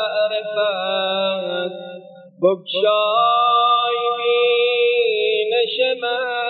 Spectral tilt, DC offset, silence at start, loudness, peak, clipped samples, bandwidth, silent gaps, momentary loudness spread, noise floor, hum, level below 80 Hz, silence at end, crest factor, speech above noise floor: -8 dB/octave; under 0.1%; 0 s; -18 LUFS; -4 dBFS; under 0.1%; 4.7 kHz; none; 8 LU; -39 dBFS; none; under -90 dBFS; 0 s; 14 dB; 22 dB